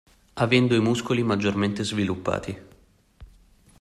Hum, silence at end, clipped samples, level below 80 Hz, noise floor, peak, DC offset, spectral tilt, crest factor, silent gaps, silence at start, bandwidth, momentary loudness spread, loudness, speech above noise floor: none; 0.55 s; under 0.1%; -54 dBFS; -56 dBFS; -6 dBFS; under 0.1%; -6 dB/octave; 18 dB; none; 0.35 s; 12.5 kHz; 14 LU; -24 LUFS; 33 dB